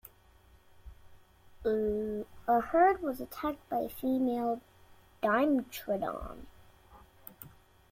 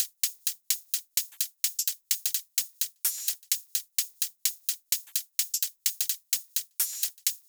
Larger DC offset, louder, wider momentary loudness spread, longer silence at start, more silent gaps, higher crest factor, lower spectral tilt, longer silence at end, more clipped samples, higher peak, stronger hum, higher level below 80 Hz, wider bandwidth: neither; second, -32 LUFS vs -28 LUFS; first, 23 LU vs 3 LU; first, 0.85 s vs 0 s; neither; about the same, 20 dB vs 22 dB; first, -6 dB/octave vs 8.5 dB/octave; first, 0.45 s vs 0.1 s; neither; second, -14 dBFS vs -10 dBFS; neither; first, -58 dBFS vs under -90 dBFS; second, 16.5 kHz vs over 20 kHz